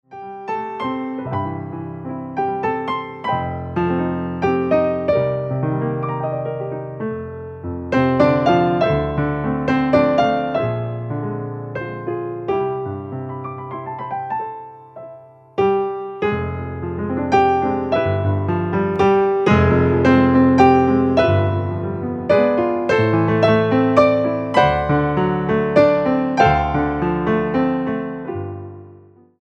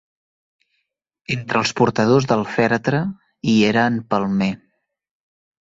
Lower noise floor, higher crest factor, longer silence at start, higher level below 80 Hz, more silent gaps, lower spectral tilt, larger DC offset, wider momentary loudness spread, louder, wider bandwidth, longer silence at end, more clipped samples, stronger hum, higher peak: second, -46 dBFS vs -75 dBFS; about the same, 18 dB vs 18 dB; second, 0.1 s vs 1.3 s; first, -40 dBFS vs -56 dBFS; neither; first, -8 dB/octave vs -6 dB/octave; neither; first, 14 LU vs 11 LU; about the same, -19 LUFS vs -19 LUFS; about the same, 8 kHz vs 7.8 kHz; second, 0.45 s vs 1.1 s; neither; neither; about the same, 0 dBFS vs -2 dBFS